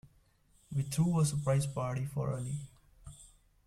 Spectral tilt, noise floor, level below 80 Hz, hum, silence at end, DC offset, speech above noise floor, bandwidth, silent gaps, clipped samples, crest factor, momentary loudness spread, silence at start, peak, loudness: -6.5 dB/octave; -67 dBFS; -58 dBFS; none; 0.4 s; under 0.1%; 35 dB; 14.5 kHz; none; under 0.1%; 14 dB; 23 LU; 0.7 s; -20 dBFS; -34 LUFS